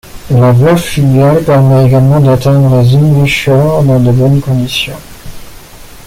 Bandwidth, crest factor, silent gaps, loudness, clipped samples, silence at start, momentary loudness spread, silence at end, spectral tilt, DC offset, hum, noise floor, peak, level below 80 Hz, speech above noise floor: 15.5 kHz; 8 dB; none; -8 LUFS; under 0.1%; 0.05 s; 6 LU; 0.05 s; -7 dB/octave; under 0.1%; none; -30 dBFS; 0 dBFS; -32 dBFS; 24 dB